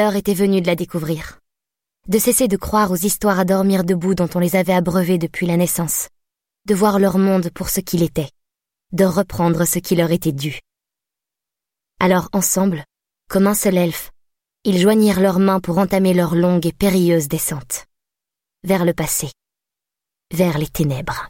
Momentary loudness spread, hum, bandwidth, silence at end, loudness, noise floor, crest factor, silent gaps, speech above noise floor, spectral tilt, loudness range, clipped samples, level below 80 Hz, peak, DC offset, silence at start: 11 LU; none; 17 kHz; 0 s; -17 LUFS; -86 dBFS; 16 dB; none; 69 dB; -5.5 dB/octave; 4 LU; under 0.1%; -44 dBFS; -4 dBFS; under 0.1%; 0 s